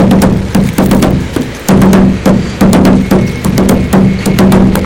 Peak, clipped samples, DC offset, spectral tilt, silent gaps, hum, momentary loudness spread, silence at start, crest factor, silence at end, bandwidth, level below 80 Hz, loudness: 0 dBFS; 0.4%; under 0.1%; -6.5 dB/octave; none; none; 5 LU; 0 s; 8 dB; 0 s; 17 kHz; -22 dBFS; -8 LUFS